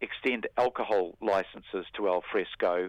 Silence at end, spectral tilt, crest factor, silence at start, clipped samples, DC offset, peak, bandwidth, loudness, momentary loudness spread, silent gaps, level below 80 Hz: 0 s; -5.5 dB/octave; 16 dB; 0 s; under 0.1%; under 0.1%; -14 dBFS; 10 kHz; -30 LUFS; 7 LU; none; -64 dBFS